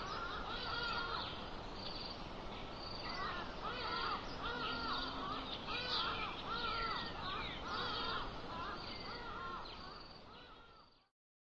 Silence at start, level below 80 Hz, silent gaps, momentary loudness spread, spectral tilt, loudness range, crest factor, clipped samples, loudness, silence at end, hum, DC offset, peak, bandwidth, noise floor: 0 s; -56 dBFS; none; 10 LU; -4.5 dB/octave; 4 LU; 16 dB; under 0.1%; -42 LUFS; 0.5 s; none; under 0.1%; -28 dBFS; 8 kHz; -63 dBFS